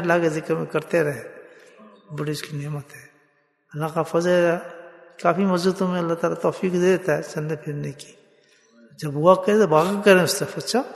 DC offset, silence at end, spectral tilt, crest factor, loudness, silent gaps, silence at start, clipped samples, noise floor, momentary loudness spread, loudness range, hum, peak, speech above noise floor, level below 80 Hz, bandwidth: under 0.1%; 0 s; -5.5 dB/octave; 22 dB; -22 LUFS; none; 0 s; under 0.1%; -64 dBFS; 16 LU; 8 LU; none; -2 dBFS; 43 dB; -66 dBFS; 12.5 kHz